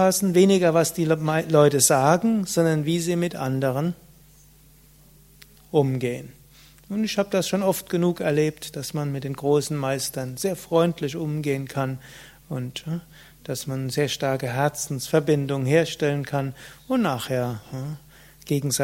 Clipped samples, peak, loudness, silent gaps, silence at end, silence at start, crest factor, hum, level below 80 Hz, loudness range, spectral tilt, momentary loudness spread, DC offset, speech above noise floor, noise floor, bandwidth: under 0.1%; -2 dBFS; -23 LUFS; none; 0 s; 0 s; 20 dB; none; -58 dBFS; 8 LU; -5 dB/octave; 14 LU; under 0.1%; 30 dB; -53 dBFS; 16.5 kHz